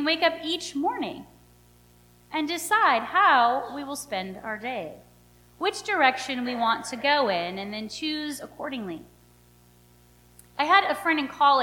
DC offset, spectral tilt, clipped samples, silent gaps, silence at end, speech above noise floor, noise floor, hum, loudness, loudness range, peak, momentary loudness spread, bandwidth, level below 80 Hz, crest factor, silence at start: under 0.1%; -2.5 dB/octave; under 0.1%; none; 0 s; 31 dB; -56 dBFS; 60 Hz at -55 dBFS; -25 LUFS; 5 LU; -4 dBFS; 14 LU; 19 kHz; -62 dBFS; 22 dB; 0 s